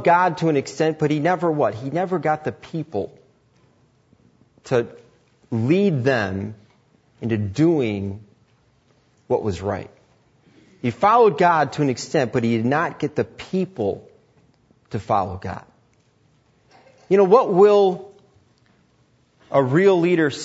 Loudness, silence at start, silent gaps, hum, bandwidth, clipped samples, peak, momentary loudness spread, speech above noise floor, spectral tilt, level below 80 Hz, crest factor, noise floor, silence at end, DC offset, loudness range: -20 LUFS; 0 s; none; none; 8 kHz; under 0.1%; -2 dBFS; 16 LU; 41 dB; -7 dB/octave; -60 dBFS; 18 dB; -60 dBFS; 0 s; under 0.1%; 9 LU